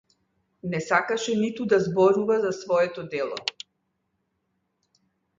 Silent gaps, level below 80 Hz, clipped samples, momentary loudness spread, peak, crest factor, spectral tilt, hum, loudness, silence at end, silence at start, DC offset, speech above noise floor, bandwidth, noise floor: none; -68 dBFS; under 0.1%; 12 LU; -6 dBFS; 20 dB; -5 dB/octave; none; -24 LUFS; 1.85 s; 0.65 s; under 0.1%; 52 dB; 7.6 kHz; -76 dBFS